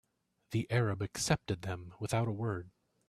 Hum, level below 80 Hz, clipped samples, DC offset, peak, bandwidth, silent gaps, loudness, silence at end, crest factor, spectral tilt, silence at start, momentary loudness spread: none; -60 dBFS; under 0.1%; under 0.1%; -16 dBFS; 14.5 kHz; none; -35 LUFS; 0.4 s; 20 dB; -5 dB/octave; 0.5 s; 8 LU